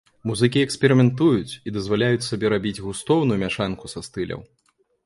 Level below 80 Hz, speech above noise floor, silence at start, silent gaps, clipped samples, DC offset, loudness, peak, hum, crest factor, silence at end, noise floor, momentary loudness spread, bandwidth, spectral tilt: -50 dBFS; 45 dB; 0.25 s; none; under 0.1%; under 0.1%; -22 LUFS; -2 dBFS; none; 20 dB; 0.6 s; -66 dBFS; 13 LU; 11.5 kHz; -6 dB/octave